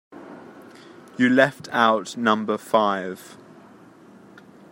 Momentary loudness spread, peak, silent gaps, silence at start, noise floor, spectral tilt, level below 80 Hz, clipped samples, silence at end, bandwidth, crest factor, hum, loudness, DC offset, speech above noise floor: 24 LU; -2 dBFS; none; 0.15 s; -48 dBFS; -5 dB/octave; -74 dBFS; under 0.1%; 1.4 s; 16 kHz; 22 dB; none; -21 LUFS; under 0.1%; 27 dB